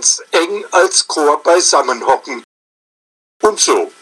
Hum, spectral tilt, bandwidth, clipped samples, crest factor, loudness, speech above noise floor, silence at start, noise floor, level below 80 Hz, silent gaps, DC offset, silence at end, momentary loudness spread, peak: none; 0.5 dB/octave; 13 kHz; under 0.1%; 14 dB; -13 LUFS; over 77 dB; 0 s; under -90 dBFS; -60 dBFS; 2.44-3.40 s; under 0.1%; 0.15 s; 6 LU; 0 dBFS